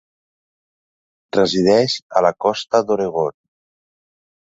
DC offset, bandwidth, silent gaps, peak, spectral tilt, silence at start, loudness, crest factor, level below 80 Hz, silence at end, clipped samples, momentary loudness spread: under 0.1%; 8 kHz; 2.02-2.10 s; -2 dBFS; -5 dB/octave; 1.35 s; -18 LUFS; 18 dB; -58 dBFS; 1.2 s; under 0.1%; 8 LU